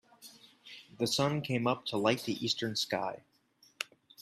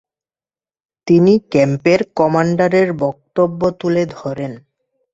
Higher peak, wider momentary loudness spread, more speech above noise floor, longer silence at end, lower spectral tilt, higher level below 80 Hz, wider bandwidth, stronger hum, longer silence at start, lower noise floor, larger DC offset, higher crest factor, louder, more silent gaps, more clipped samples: second, -12 dBFS vs 0 dBFS; first, 20 LU vs 12 LU; second, 35 dB vs over 75 dB; second, 0 s vs 0.55 s; second, -4.5 dB/octave vs -7.5 dB/octave; second, -72 dBFS vs -54 dBFS; first, 15.5 kHz vs 7.8 kHz; neither; second, 0.2 s vs 1.05 s; second, -67 dBFS vs under -90 dBFS; neither; first, 22 dB vs 16 dB; second, -33 LUFS vs -15 LUFS; neither; neither